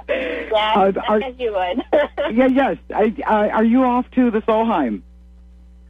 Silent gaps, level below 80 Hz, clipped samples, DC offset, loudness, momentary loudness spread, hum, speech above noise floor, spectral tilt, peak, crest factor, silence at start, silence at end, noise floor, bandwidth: none; -44 dBFS; under 0.1%; under 0.1%; -18 LUFS; 7 LU; none; 26 dB; -7.5 dB/octave; -4 dBFS; 14 dB; 0.1 s; 0.9 s; -44 dBFS; 5 kHz